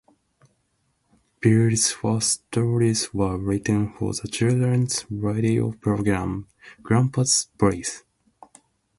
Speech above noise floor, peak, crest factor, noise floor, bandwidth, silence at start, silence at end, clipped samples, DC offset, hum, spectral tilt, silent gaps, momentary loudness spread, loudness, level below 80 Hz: 48 dB; -6 dBFS; 18 dB; -70 dBFS; 11.5 kHz; 1.4 s; 1 s; under 0.1%; under 0.1%; none; -5 dB/octave; none; 8 LU; -22 LUFS; -48 dBFS